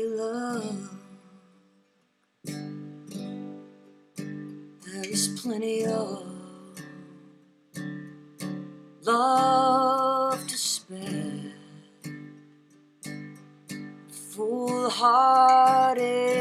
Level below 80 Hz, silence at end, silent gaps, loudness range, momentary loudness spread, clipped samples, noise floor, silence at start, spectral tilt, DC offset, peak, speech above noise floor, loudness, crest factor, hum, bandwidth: -80 dBFS; 0 s; none; 17 LU; 24 LU; under 0.1%; -70 dBFS; 0 s; -4 dB/octave; under 0.1%; -8 dBFS; 46 dB; -24 LUFS; 20 dB; none; 15 kHz